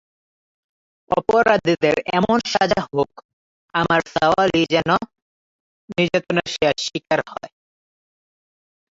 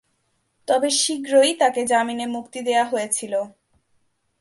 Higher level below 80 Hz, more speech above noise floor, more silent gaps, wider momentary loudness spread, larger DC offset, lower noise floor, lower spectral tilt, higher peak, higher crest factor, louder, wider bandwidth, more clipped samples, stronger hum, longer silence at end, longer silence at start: first, -52 dBFS vs -72 dBFS; first, over 71 dB vs 49 dB; first, 3.25-3.68 s, 5.22-5.88 s vs none; about the same, 8 LU vs 10 LU; neither; first, under -90 dBFS vs -69 dBFS; first, -5 dB/octave vs -1.5 dB/octave; about the same, -2 dBFS vs -4 dBFS; about the same, 20 dB vs 18 dB; about the same, -19 LUFS vs -21 LUFS; second, 7.8 kHz vs 12 kHz; neither; neither; first, 1.55 s vs 0.9 s; first, 1.1 s vs 0.7 s